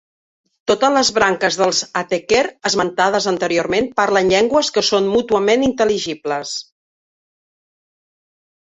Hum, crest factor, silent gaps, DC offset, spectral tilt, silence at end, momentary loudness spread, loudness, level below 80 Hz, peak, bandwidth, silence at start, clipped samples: none; 18 dB; none; under 0.1%; -3 dB/octave; 2.05 s; 8 LU; -16 LUFS; -52 dBFS; 0 dBFS; 8 kHz; 0.65 s; under 0.1%